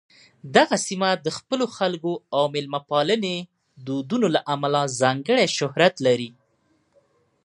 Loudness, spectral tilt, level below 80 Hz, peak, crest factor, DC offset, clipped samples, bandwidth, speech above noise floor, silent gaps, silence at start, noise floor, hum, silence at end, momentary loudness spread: -22 LUFS; -4 dB/octave; -70 dBFS; 0 dBFS; 22 dB; under 0.1%; under 0.1%; 11.5 kHz; 44 dB; none; 0.45 s; -66 dBFS; none; 1.15 s; 9 LU